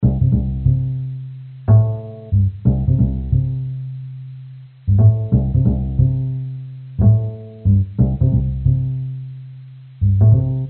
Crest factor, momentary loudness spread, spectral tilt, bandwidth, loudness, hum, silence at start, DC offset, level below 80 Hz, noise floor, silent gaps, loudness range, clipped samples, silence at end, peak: 14 dB; 17 LU; -13.5 dB/octave; 1.6 kHz; -18 LUFS; none; 0 s; under 0.1%; -28 dBFS; -37 dBFS; none; 1 LU; under 0.1%; 0 s; -2 dBFS